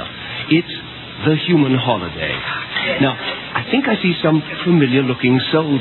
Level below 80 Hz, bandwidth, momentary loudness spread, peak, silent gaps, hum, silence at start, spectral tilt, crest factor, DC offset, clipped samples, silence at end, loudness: -50 dBFS; 4.3 kHz; 8 LU; -2 dBFS; none; none; 0 s; -9.5 dB/octave; 14 dB; under 0.1%; under 0.1%; 0 s; -17 LUFS